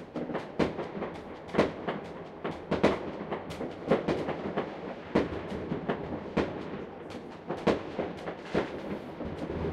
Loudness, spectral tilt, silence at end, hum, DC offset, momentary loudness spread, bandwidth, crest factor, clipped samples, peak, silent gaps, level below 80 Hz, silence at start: -34 LUFS; -7 dB/octave; 0 s; none; under 0.1%; 11 LU; 12.5 kHz; 22 dB; under 0.1%; -10 dBFS; none; -54 dBFS; 0 s